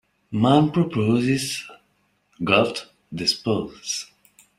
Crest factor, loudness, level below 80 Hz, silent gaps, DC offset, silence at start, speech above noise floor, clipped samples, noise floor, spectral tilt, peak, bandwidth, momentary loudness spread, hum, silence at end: 20 dB; -22 LUFS; -58 dBFS; none; under 0.1%; 0.3 s; 45 dB; under 0.1%; -67 dBFS; -5 dB/octave; -2 dBFS; 16 kHz; 14 LU; 50 Hz at -50 dBFS; 0.55 s